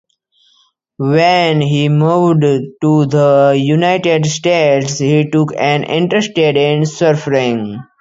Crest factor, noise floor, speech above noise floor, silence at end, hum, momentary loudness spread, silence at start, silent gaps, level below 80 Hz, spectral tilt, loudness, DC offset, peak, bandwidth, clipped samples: 12 dB; -56 dBFS; 44 dB; 0.2 s; none; 4 LU; 1 s; none; -56 dBFS; -6 dB/octave; -12 LUFS; under 0.1%; 0 dBFS; 7.8 kHz; under 0.1%